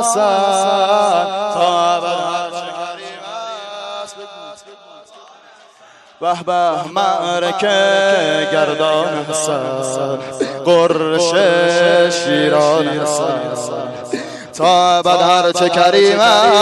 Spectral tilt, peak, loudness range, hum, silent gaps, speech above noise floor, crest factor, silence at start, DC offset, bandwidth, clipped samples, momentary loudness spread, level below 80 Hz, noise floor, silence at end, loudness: -3 dB/octave; -2 dBFS; 12 LU; none; none; 31 dB; 14 dB; 0 s; under 0.1%; 12 kHz; under 0.1%; 16 LU; -62 dBFS; -45 dBFS; 0 s; -14 LUFS